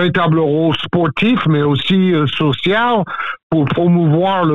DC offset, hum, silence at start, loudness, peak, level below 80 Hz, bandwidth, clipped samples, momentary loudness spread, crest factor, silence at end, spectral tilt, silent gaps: 1%; none; 0 s; -14 LUFS; -4 dBFS; -48 dBFS; 6.8 kHz; under 0.1%; 4 LU; 10 dB; 0 s; -8.5 dB/octave; 3.43-3.50 s